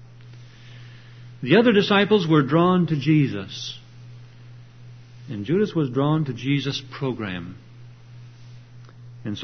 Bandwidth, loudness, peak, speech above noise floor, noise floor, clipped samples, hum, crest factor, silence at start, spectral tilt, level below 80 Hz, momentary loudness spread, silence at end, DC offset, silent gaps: 6.4 kHz; -21 LUFS; -4 dBFS; 23 dB; -44 dBFS; under 0.1%; none; 20 dB; 0 s; -7 dB/octave; -60 dBFS; 19 LU; 0 s; under 0.1%; none